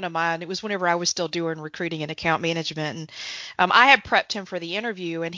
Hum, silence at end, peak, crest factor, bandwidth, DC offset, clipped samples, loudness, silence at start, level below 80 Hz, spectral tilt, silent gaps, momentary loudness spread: none; 0 s; -2 dBFS; 22 dB; 7.6 kHz; under 0.1%; under 0.1%; -23 LUFS; 0 s; -60 dBFS; -3 dB/octave; none; 15 LU